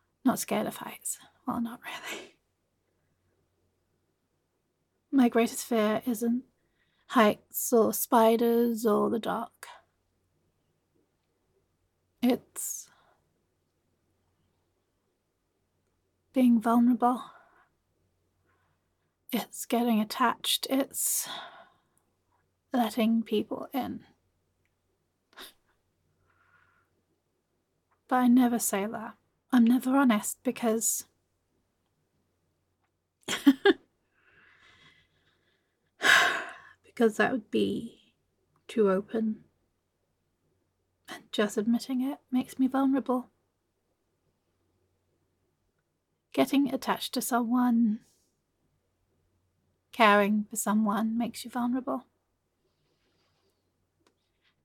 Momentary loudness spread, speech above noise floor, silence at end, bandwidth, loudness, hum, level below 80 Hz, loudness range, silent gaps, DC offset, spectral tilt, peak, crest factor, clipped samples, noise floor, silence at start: 14 LU; 52 dB; 2.65 s; 17.5 kHz; -27 LUFS; none; -78 dBFS; 10 LU; none; under 0.1%; -3.5 dB/octave; -6 dBFS; 24 dB; under 0.1%; -79 dBFS; 0.25 s